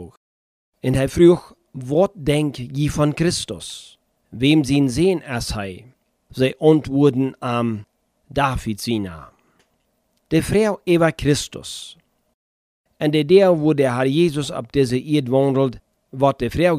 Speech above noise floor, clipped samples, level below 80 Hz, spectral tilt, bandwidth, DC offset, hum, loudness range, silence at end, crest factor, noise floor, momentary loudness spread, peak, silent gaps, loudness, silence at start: 49 dB; under 0.1%; -42 dBFS; -6 dB/octave; 15.5 kHz; under 0.1%; none; 4 LU; 0 s; 18 dB; -67 dBFS; 16 LU; -2 dBFS; 0.17-0.72 s, 12.34-12.84 s; -19 LUFS; 0 s